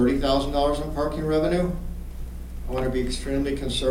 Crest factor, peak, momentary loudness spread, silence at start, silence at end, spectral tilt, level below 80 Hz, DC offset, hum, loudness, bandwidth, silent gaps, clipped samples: 14 dB; -10 dBFS; 15 LU; 0 s; 0 s; -6 dB/octave; -32 dBFS; under 0.1%; 60 Hz at -35 dBFS; -25 LUFS; 16.5 kHz; none; under 0.1%